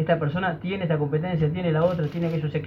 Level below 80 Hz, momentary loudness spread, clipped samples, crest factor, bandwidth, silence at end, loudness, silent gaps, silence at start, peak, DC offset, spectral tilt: -52 dBFS; 4 LU; under 0.1%; 16 dB; 5.6 kHz; 0 s; -25 LUFS; none; 0 s; -8 dBFS; under 0.1%; -9.5 dB/octave